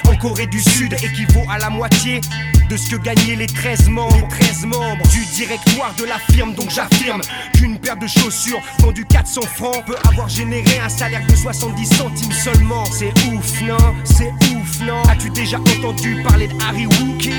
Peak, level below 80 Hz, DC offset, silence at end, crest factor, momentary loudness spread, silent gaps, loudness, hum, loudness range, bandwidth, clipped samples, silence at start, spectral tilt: 0 dBFS; -18 dBFS; under 0.1%; 0 s; 14 dB; 6 LU; none; -15 LUFS; none; 1 LU; over 20 kHz; under 0.1%; 0 s; -4.5 dB/octave